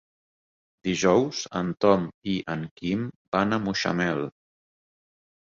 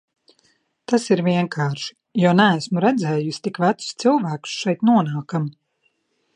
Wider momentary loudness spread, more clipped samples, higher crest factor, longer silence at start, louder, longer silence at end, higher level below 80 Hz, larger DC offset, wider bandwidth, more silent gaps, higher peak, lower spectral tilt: about the same, 10 LU vs 10 LU; neither; about the same, 22 dB vs 20 dB; about the same, 0.85 s vs 0.9 s; second, -26 LUFS vs -20 LUFS; first, 1.2 s vs 0.85 s; first, -58 dBFS vs -70 dBFS; neither; second, 7.6 kHz vs 10.5 kHz; first, 2.14-2.22 s, 2.71-2.76 s, 3.16-3.32 s vs none; second, -6 dBFS vs -2 dBFS; about the same, -5 dB/octave vs -6 dB/octave